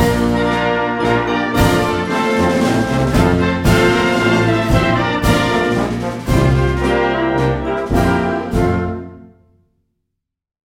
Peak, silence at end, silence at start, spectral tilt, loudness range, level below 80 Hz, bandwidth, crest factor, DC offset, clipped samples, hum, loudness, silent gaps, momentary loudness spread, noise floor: 0 dBFS; 1.5 s; 0 s; -6 dB/octave; 4 LU; -28 dBFS; 17.5 kHz; 14 dB; under 0.1%; under 0.1%; none; -15 LUFS; none; 4 LU; -76 dBFS